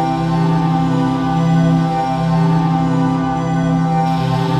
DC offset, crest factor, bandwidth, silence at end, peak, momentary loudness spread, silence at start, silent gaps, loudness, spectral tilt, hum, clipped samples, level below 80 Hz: under 0.1%; 10 dB; 8.4 kHz; 0 s; -4 dBFS; 3 LU; 0 s; none; -16 LUFS; -8 dB/octave; none; under 0.1%; -38 dBFS